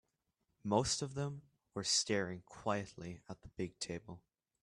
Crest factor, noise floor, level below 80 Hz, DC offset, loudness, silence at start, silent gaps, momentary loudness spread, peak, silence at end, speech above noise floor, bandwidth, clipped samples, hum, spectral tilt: 22 dB; -84 dBFS; -66 dBFS; under 0.1%; -38 LUFS; 0.65 s; none; 18 LU; -18 dBFS; 0.45 s; 45 dB; 12.5 kHz; under 0.1%; none; -3.5 dB/octave